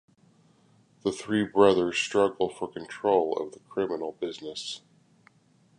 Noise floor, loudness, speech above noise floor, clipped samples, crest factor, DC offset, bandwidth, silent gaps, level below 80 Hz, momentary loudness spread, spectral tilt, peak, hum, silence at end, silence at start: -63 dBFS; -27 LUFS; 36 dB; under 0.1%; 22 dB; under 0.1%; 11 kHz; none; -66 dBFS; 15 LU; -4.5 dB/octave; -8 dBFS; none; 1 s; 1.05 s